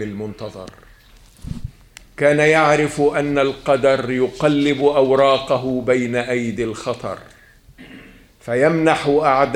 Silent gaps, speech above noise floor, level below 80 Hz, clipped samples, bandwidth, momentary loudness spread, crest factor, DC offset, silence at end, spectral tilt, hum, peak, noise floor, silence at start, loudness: none; 30 dB; -46 dBFS; under 0.1%; 13 kHz; 18 LU; 18 dB; under 0.1%; 0 s; -5.5 dB/octave; none; 0 dBFS; -47 dBFS; 0 s; -17 LUFS